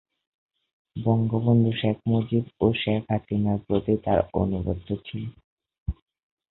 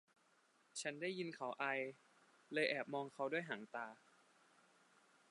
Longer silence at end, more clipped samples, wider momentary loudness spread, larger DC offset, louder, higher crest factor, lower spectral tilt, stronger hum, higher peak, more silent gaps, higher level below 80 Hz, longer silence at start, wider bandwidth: second, 0.6 s vs 1.35 s; neither; first, 15 LU vs 10 LU; neither; first, -25 LUFS vs -44 LUFS; second, 18 dB vs 24 dB; first, -12 dB/octave vs -3.5 dB/octave; neither; first, -6 dBFS vs -24 dBFS; first, 5.44-5.57 s, 5.80-5.86 s vs none; first, -44 dBFS vs under -90 dBFS; first, 0.95 s vs 0.75 s; second, 4.1 kHz vs 11 kHz